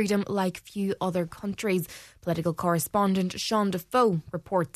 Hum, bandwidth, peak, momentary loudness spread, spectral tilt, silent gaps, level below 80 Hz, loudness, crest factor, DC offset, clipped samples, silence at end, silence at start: none; 14 kHz; -10 dBFS; 8 LU; -5.5 dB/octave; none; -60 dBFS; -27 LUFS; 16 dB; under 0.1%; under 0.1%; 0.1 s; 0 s